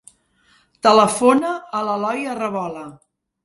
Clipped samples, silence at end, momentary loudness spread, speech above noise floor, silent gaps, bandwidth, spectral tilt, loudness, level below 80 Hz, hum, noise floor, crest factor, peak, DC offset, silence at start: under 0.1%; 0.5 s; 15 LU; 40 dB; none; 11.5 kHz; -4 dB/octave; -18 LUFS; -64 dBFS; none; -58 dBFS; 20 dB; 0 dBFS; under 0.1%; 0.85 s